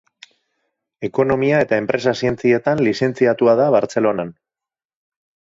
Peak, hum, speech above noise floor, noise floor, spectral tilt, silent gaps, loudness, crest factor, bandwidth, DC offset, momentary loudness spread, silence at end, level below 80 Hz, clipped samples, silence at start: -2 dBFS; none; 73 dB; -90 dBFS; -6.5 dB/octave; none; -17 LUFS; 16 dB; 7.8 kHz; under 0.1%; 8 LU; 1.25 s; -54 dBFS; under 0.1%; 1 s